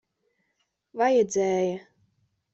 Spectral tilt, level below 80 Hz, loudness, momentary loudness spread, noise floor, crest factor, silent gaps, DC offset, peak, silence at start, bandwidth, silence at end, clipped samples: -5 dB/octave; -72 dBFS; -24 LUFS; 16 LU; -76 dBFS; 18 dB; none; under 0.1%; -10 dBFS; 0.95 s; 8 kHz; 0.75 s; under 0.1%